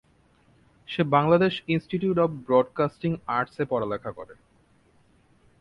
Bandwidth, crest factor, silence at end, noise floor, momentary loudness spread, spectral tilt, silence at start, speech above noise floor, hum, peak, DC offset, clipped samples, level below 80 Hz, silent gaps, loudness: 5.8 kHz; 20 dB; 1.25 s; -62 dBFS; 13 LU; -8.5 dB/octave; 0.9 s; 37 dB; none; -6 dBFS; under 0.1%; under 0.1%; -60 dBFS; none; -25 LUFS